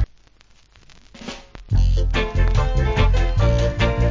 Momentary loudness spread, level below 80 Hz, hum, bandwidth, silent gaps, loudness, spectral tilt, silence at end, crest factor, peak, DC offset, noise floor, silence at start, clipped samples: 16 LU; -20 dBFS; none; 7.6 kHz; none; -20 LUFS; -6.5 dB/octave; 0 s; 14 dB; -6 dBFS; under 0.1%; -52 dBFS; 0 s; under 0.1%